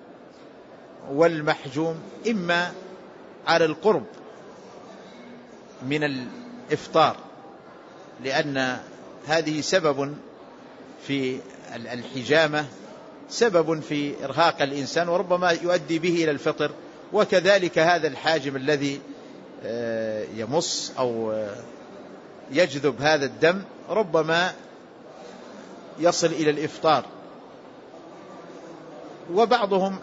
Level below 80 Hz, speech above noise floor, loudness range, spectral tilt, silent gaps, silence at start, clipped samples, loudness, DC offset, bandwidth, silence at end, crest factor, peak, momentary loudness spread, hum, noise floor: -68 dBFS; 23 dB; 5 LU; -4.5 dB/octave; none; 0 s; under 0.1%; -24 LUFS; under 0.1%; 8 kHz; 0 s; 20 dB; -4 dBFS; 23 LU; none; -46 dBFS